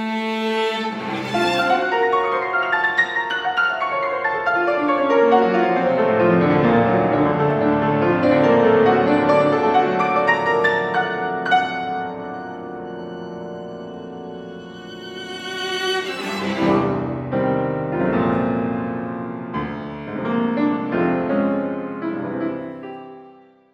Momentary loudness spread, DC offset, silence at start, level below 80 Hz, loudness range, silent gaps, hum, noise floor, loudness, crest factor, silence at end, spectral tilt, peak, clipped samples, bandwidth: 16 LU; under 0.1%; 0 s; -52 dBFS; 10 LU; none; none; -47 dBFS; -19 LUFS; 18 dB; 0.4 s; -6.5 dB/octave; -2 dBFS; under 0.1%; 12.5 kHz